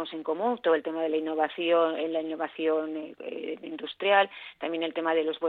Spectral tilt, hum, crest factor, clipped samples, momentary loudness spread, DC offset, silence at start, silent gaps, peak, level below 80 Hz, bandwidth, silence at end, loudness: -7 dB/octave; none; 20 dB; under 0.1%; 13 LU; under 0.1%; 0 s; none; -8 dBFS; -78 dBFS; 4.4 kHz; 0 s; -28 LUFS